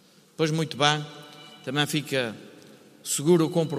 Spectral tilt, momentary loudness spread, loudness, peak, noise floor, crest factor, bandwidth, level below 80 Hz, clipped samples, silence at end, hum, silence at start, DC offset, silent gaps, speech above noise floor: -4.5 dB/octave; 19 LU; -25 LUFS; -4 dBFS; -51 dBFS; 24 dB; 15.5 kHz; -72 dBFS; under 0.1%; 0 s; none; 0.4 s; under 0.1%; none; 26 dB